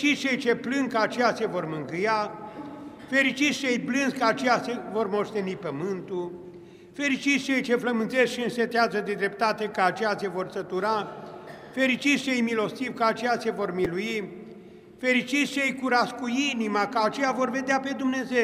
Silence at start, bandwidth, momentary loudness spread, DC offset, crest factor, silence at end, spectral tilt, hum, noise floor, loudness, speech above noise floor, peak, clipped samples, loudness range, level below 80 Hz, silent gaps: 0 s; 15 kHz; 10 LU; under 0.1%; 20 dB; 0 s; -4 dB/octave; none; -47 dBFS; -26 LUFS; 21 dB; -8 dBFS; under 0.1%; 2 LU; -68 dBFS; none